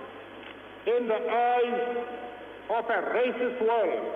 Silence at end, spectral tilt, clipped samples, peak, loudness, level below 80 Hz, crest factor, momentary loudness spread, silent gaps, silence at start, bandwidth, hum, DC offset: 0 s; -6 dB/octave; under 0.1%; -16 dBFS; -28 LUFS; -70 dBFS; 12 dB; 18 LU; none; 0 s; 4 kHz; none; under 0.1%